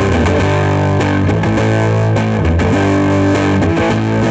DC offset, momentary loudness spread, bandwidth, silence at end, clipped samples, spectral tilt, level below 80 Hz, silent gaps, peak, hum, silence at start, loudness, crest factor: under 0.1%; 1 LU; 8.6 kHz; 0 s; under 0.1%; -7 dB/octave; -28 dBFS; none; -2 dBFS; none; 0 s; -13 LUFS; 12 dB